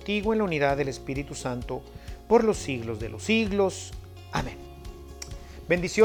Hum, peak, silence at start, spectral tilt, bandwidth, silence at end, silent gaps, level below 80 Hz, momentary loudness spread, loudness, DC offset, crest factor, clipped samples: none; -8 dBFS; 0 s; -5 dB/octave; 18 kHz; 0 s; none; -44 dBFS; 20 LU; -27 LUFS; under 0.1%; 20 dB; under 0.1%